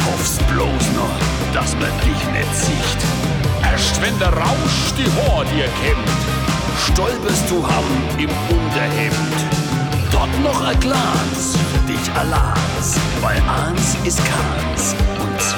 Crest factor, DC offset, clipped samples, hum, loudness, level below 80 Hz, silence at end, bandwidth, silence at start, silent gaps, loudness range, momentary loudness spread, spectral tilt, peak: 14 dB; under 0.1%; under 0.1%; none; -17 LUFS; -24 dBFS; 0 s; 19.5 kHz; 0 s; none; 1 LU; 3 LU; -4.5 dB/octave; -2 dBFS